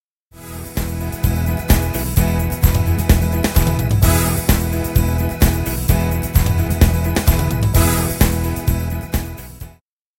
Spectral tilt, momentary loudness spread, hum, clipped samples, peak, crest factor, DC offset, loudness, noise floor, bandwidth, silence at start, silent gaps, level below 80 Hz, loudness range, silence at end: -5.5 dB/octave; 9 LU; none; under 0.1%; 0 dBFS; 16 dB; under 0.1%; -17 LUFS; -50 dBFS; 17 kHz; 0.35 s; none; -20 dBFS; 2 LU; 0.5 s